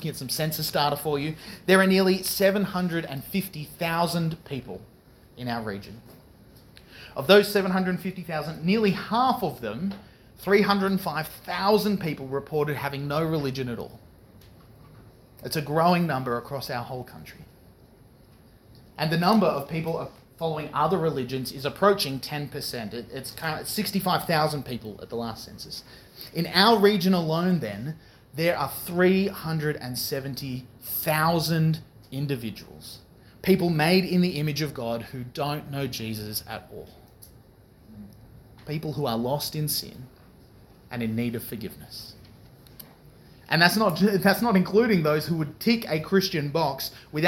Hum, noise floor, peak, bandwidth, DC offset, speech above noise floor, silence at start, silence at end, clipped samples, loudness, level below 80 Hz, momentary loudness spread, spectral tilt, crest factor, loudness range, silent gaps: none; -54 dBFS; -2 dBFS; 19 kHz; under 0.1%; 28 dB; 0 s; 0 s; under 0.1%; -25 LUFS; -56 dBFS; 18 LU; -5.5 dB/octave; 24 dB; 8 LU; none